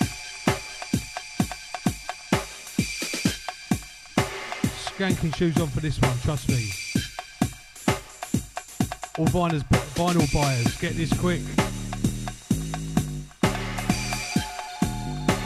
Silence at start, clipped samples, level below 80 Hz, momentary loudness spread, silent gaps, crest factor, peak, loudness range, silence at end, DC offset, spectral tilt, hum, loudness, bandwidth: 0 s; under 0.1%; -40 dBFS; 7 LU; none; 20 dB; -6 dBFS; 4 LU; 0 s; under 0.1%; -5 dB/octave; none; -27 LUFS; 15.5 kHz